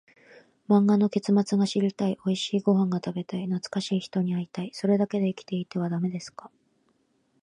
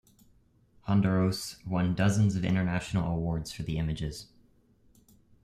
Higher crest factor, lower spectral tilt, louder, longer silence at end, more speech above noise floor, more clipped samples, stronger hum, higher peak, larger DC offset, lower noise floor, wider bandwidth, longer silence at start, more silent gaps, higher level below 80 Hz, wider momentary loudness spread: about the same, 16 dB vs 18 dB; about the same, -7 dB/octave vs -6.5 dB/octave; first, -26 LUFS vs -29 LUFS; second, 1 s vs 1.2 s; first, 44 dB vs 35 dB; neither; neither; about the same, -10 dBFS vs -12 dBFS; neither; first, -69 dBFS vs -64 dBFS; second, 10 kHz vs 14 kHz; second, 0.7 s vs 0.85 s; neither; second, -74 dBFS vs -50 dBFS; about the same, 9 LU vs 11 LU